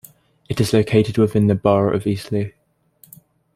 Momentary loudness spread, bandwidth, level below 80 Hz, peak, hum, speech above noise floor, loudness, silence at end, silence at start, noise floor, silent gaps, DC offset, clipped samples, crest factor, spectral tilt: 9 LU; 15.5 kHz; -50 dBFS; -2 dBFS; none; 38 dB; -18 LUFS; 1.05 s; 0.5 s; -55 dBFS; none; under 0.1%; under 0.1%; 18 dB; -7 dB/octave